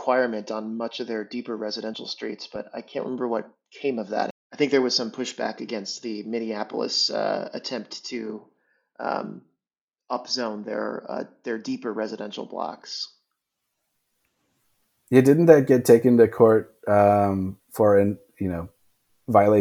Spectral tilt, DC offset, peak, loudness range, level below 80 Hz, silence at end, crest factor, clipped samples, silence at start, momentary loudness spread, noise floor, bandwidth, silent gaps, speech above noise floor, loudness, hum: -5.5 dB/octave; under 0.1%; -2 dBFS; 14 LU; -64 dBFS; 0 s; 22 dB; under 0.1%; 0 s; 17 LU; under -90 dBFS; 16 kHz; 4.31-4.50 s, 9.81-9.88 s; over 67 dB; -24 LUFS; none